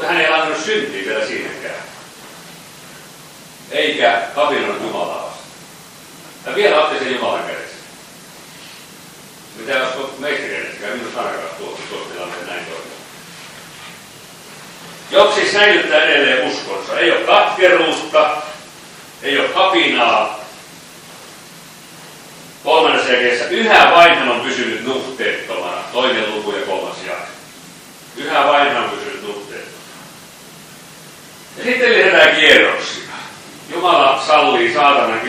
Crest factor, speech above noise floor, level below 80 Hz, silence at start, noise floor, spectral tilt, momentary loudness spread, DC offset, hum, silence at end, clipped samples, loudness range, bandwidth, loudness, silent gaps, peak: 16 dB; 24 dB; -60 dBFS; 0 s; -39 dBFS; -2.5 dB/octave; 25 LU; under 0.1%; none; 0 s; 0.1%; 12 LU; 15.5 kHz; -14 LUFS; none; 0 dBFS